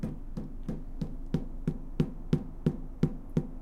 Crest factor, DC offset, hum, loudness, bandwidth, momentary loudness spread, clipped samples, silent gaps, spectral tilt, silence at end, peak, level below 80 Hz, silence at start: 20 dB; under 0.1%; none; -35 LUFS; 8.8 kHz; 10 LU; under 0.1%; none; -9 dB/octave; 0 s; -14 dBFS; -40 dBFS; 0 s